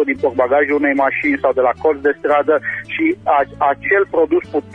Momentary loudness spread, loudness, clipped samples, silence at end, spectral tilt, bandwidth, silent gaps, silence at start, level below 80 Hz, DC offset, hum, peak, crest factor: 4 LU; -16 LUFS; under 0.1%; 0 s; -7.5 dB/octave; 6 kHz; none; 0 s; -50 dBFS; under 0.1%; none; -2 dBFS; 14 dB